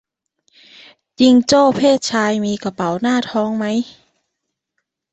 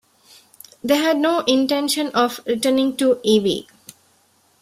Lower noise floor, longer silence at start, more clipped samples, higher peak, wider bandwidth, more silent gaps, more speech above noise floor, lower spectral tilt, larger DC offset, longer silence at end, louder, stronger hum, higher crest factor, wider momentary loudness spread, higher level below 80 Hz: first, -77 dBFS vs -59 dBFS; first, 1.2 s vs 0.85 s; neither; about the same, -2 dBFS vs -2 dBFS; second, 8.2 kHz vs 16 kHz; neither; first, 62 dB vs 41 dB; about the same, -4.5 dB/octave vs -3.5 dB/octave; neither; first, 1.25 s vs 1 s; first, -16 LUFS vs -19 LUFS; neither; about the same, 16 dB vs 18 dB; first, 10 LU vs 5 LU; about the same, -58 dBFS vs -62 dBFS